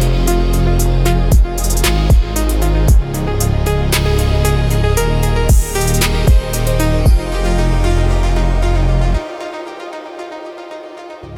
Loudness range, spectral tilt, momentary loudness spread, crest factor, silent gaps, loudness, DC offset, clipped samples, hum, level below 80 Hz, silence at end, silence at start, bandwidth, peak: 3 LU; -5.5 dB/octave; 15 LU; 12 dB; none; -15 LUFS; under 0.1%; under 0.1%; none; -14 dBFS; 0 s; 0 s; 16.5 kHz; -2 dBFS